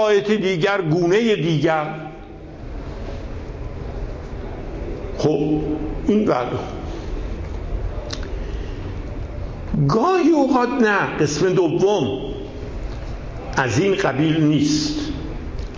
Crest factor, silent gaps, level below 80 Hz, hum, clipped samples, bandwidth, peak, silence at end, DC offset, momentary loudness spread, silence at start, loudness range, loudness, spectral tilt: 16 dB; none; -32 dBFS; none; under 0.1%; 7.8 kHz; -6 dBFS; 0 s; under 0.1%; 15 LU; 0 s; 9 LU; -20 LUFS; -6 dB/octave